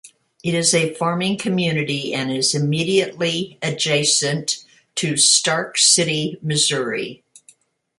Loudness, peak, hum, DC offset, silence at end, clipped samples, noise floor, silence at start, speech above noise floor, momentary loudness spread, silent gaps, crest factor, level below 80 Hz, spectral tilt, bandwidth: -18 LUFS; 0 dBFS; none; under 0.1%; 0.85 s; under 0.1%; -54 dBFS; 0.05 s; 35 dB; 12 LU; none; 20 dB; -62 dBFS; -2.5 dB/octave; 11.5 kHz